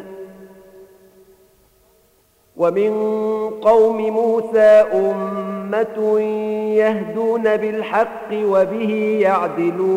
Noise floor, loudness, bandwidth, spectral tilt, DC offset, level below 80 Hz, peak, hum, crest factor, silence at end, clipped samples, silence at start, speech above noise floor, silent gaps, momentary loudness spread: -57 dBFS; -17 LUFS; 10 kHz; -7 dB/octave; under 0.1%; -62 dBFS; -2 dBFS; none; 16 dB; 0 s; under 0.1%; 0 s; 41 dB; none; 9 LU